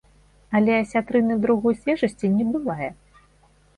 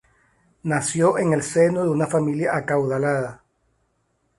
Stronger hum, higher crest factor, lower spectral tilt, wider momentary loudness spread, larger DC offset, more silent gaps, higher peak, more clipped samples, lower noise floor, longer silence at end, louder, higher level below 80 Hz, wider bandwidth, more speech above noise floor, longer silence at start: first, 50 Hz at -50 dBFS vs none; about the same, 14 dB vs 16 dB; first, -7.5 dB/octave vs -6 dB/octave; about the same, 7 LU vs 7 LU; neither; neither; about the same, -8 dBFS vs -6 dBFS; neither; second, -57 dBFS vs -69 dBFS; second, 0.85 s vs 1.05 s; about the same, -22 LUFS vs -21 LUFS; first, -54 dBFS vs -60 dBFS; about the same, 10.5 kHz vs 11.5 kHz; second, 36 dB vs 48 dB; second, 0.5 s vs 0.65 s